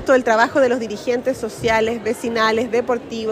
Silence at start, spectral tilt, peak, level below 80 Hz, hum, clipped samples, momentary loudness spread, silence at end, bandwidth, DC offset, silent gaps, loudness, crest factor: 0 s; -4 dB/octave; -2 dBFS; -50 dBFS; none; under 0.1%; 8 LU; 0 s; 15.5 kHz; under 0.1%; none; -19 LUFS; 18 dB